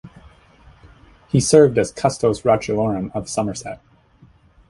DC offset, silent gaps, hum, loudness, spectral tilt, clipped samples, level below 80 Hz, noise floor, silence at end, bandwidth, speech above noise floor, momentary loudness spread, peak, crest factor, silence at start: under 0.1%; none; none; -18 LUFS; -5.5 dB/octave; under 0.1%; -48 dBFS; -52 dBFS; 0.95 s; 11.5 kHz; 34 dB; 15 LU; 0 dBFS; 20 dB; 0.05 s